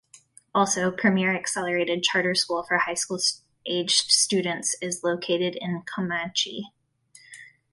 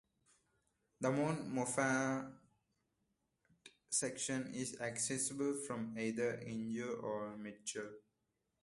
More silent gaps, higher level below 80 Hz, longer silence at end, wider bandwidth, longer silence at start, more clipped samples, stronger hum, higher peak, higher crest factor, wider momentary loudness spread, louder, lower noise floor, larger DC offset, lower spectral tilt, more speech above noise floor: neither; first, -68 dBFS vs -78 dBFS; second, 0.25 s vs 0.65 s; about the same, 12 kHz vs 11.5 kHz; second, 0.15 s vs 1 s; neither; neither; first, -4 dBFS vs -22 dBFS; about the same, 22 dB vs 20 dB; about the same, 10 LU vs 9 LU; first, -24 LUFS vs -40 LUFS; second, -56 dBFS vs -86 dBFS; neither; second, -2.5 dB/octave vs -4 dB/octave; second, 31 dB vs 46 dB